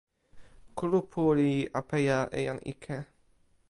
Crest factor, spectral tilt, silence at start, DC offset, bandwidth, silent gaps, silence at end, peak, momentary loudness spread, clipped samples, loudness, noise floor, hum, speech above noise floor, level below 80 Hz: 16 dB; -7 dB/octave; 0.35 s; under 0.1%; 11.5 kHz; none; 0.65 s; -14 dBFS; 14 LU; under 0.1%; -30 LUFS; -65 dBFS; none; 36 dB; -58 dBFS